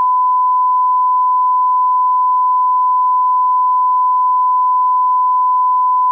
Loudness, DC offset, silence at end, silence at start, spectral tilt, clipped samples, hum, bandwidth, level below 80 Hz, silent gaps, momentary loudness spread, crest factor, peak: -13 LUFS; under 0.1%; 0 s; 0 s; 0 dB/octave; under 0.1%; none; 1.2 kHz; under -90 dBFS; none; 0 LU; 4 dB; -10 dBFS